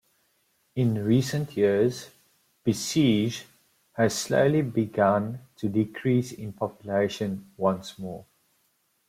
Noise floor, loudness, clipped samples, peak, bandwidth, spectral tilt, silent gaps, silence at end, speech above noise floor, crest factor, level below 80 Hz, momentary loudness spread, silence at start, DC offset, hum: -70 dBFS; -26 LUFS; under 0.1%; -10 dBFS; 16 kHz; -6 dB/octave; none; 0.85 s; 45 dB; 18 dB; -64 dBFS; 14 LU; 0.75 s; under 0.1%; none